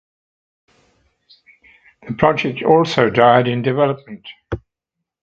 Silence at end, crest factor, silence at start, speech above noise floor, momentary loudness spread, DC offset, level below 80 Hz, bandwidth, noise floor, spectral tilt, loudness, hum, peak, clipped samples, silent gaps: 0.65 s; 18 dB; 2.05 s; 65 dB; 18 LU; under 0.1%; -46 dBFS; 7.6 kHz; -80 dBFS; -7 dB/octave; -15 LUFS; none; 0 dBFS; under 0.1%; none